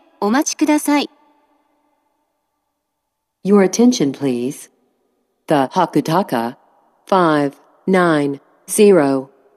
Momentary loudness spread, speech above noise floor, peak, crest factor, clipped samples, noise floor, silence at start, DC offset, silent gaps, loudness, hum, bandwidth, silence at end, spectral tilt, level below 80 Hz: 14 LU; 60 dB; -2 dBFS; 16 dB; under 0.1%; -75 dBFS; 0.2 s; under 0.1%; none; -16 LUFS; none; 14.5 kHz; 0.3 s; -5 dB/octave; -70 dBFS